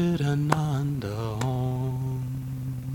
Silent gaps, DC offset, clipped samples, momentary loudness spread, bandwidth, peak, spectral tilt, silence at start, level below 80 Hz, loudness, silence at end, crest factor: none; under 0.1%; under 0.1%; 8 LU; 18 kHz; -4 dBFS; -7 dB/octave; 0 s; -48 dBFS; -28 LUFS; 0 s; 24 dB